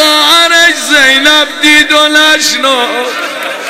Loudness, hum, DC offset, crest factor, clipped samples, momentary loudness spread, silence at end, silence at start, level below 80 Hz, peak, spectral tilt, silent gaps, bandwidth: -5 LUFS; none; under 0.1%; 8 dB; 1%; 9 LU; 0 s; 0 s; -44 dBFS; 0 dBFS; 0.5 dB/octave; none; 16.5 kHz